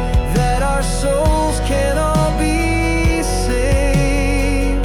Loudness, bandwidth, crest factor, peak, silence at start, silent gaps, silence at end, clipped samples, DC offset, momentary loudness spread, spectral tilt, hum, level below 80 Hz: -17 LUFS; 13.5 kHz; 10 dB; -6 dBFS; 0 s; none; 0 s; under 0.1%; under 0.1%; 2 LU; -5.5 dB/octave; none; -18 dBFS